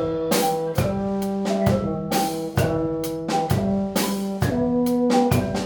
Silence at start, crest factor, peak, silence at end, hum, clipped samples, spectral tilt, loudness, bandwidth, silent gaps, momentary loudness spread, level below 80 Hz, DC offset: 0 s; 16 dB; -6 dBFS; 0 s; none; under 0.1%; -6 dB/octave; -22 LUFS; over 20 kHz; none; 5 LU; -44 dBFS; under 0.1%